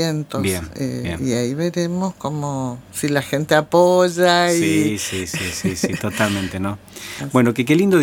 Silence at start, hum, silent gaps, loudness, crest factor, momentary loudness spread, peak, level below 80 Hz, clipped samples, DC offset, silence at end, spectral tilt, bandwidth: 0 s; none; none; -19 LUFS; 18 dB; 11 LU; 0 dBFS; -48 dBFS; under 0.1%; under 0.1%; 0 s; -5 dB/octave; 17.5 kHz